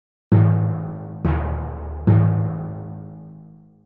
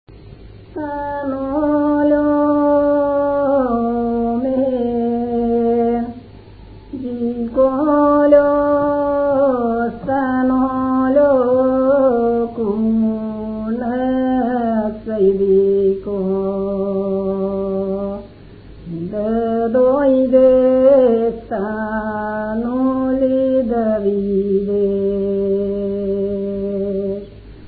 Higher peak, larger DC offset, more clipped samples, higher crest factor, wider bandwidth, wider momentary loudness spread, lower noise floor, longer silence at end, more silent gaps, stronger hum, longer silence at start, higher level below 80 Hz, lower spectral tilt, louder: second, -6 dBFS vs 0 dBFS; neither; neither; about the same, 16 dB vs 16 dB; second, 3.2 kHz vs 4.7 kHz; first, 18 LU vs 10 LU; first, -45 dBFS vs -39 dBFS; first, 0.4 s vs 0 s; neither; neither; first, 0.3 s vs 0.1 s; first, -36 dBFS vs -42 dBFS; about the same, -13 dB/octave vs -13 dB/octave; second, -21 LUFS vs -17 LUFS